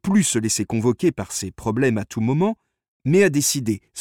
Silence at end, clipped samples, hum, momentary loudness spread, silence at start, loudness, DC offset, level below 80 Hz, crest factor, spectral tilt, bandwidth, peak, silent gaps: 0 s; under 0.1%; none; 10 LU; 0.05 s; -21 LUFS; under 0.1%; -54 dBFS; 16 dB; -5 dB/octave; 17.5 kHz; -6 dBFS; 2.88-3.00 s